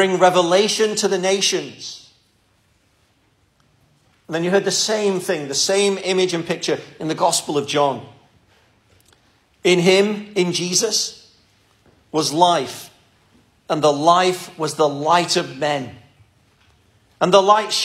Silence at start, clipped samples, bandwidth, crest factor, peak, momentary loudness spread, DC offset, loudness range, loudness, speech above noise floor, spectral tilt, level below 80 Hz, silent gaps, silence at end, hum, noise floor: 0 s; under 0.1%; 16 kHz; 20 dB; 0 dBFS; 11 LU; under 0.1%; 4 LU; -18 LUFS; 43 dB; -3 dB/octave; -66 dBFS; none; 0 s; none; -61 dBFS